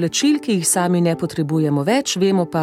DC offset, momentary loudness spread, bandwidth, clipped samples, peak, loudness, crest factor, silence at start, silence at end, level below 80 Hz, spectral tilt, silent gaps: under 0.1%; 4 LU; 16 kHz; under 0.1%; -4 dBFS; -18 LUFS; 14 dB; 0 s; 0 s; -60 dBFS; -4.5 dB/octave; none